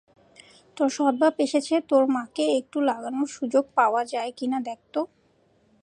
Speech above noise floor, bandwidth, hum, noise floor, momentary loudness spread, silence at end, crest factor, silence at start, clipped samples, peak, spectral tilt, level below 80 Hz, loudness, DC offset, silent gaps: 39 dB; 10.5 kHz; none; -63 dBFS; 9 LU; 0.75 s; 18 dB; 0.75 s; under 0.1%; -6 dBFS; -3.5 dB/octave; -76 dBFS; -25 LUFS; under 0.1%; none